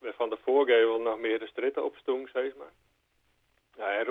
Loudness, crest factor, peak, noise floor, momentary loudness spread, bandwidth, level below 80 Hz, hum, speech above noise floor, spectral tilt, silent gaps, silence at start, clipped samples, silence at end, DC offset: -29 LUFS; 18 dB; -12 dBFS; -72 dBFS; 10 LU; 3.9 kHz; -76 dBFS; none; 43 dB; -5 dB/octave; none; 0.05 s; under 0.1%; 0 s; under 0.1%